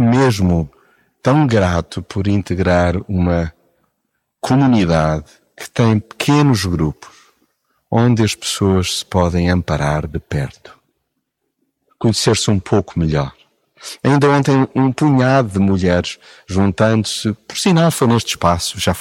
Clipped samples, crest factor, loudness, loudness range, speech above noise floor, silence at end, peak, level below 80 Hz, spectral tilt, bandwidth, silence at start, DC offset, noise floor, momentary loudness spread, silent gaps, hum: under 0.1%; 14 dB; -16 LUFS; 4 LU; 57 dB; 0 s; -2 dBFS; -36 dBFS; -6 dB/octave; 17 kHz; 0 s; under 0.1%; -72 dBFS; 10 LU; none; none